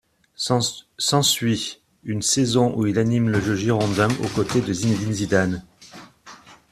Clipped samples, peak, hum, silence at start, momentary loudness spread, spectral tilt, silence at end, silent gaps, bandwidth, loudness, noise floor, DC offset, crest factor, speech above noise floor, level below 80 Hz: under 0.1%; -4 dBFS; none; 0.4 s; 8 LU; -4.5 dB/octave; 0.15 s; none; 14.5 kHz; -21 LUFS; -46 dBFS; under 0.1%; 18 dB; 25 dB; -52 dBFS